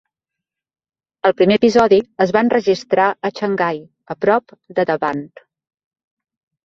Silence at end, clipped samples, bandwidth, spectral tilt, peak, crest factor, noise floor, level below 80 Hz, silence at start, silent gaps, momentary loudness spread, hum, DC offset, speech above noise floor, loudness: 1.4 s; under 0.1%; 7.6 kHz; -6 dB/octave; 0 dBFS; 18 dB; -84 dBFS; -58 dBFS; 1.25 s; none; 10 LU; none; under 0.1%; 68 dB; -16 LUFS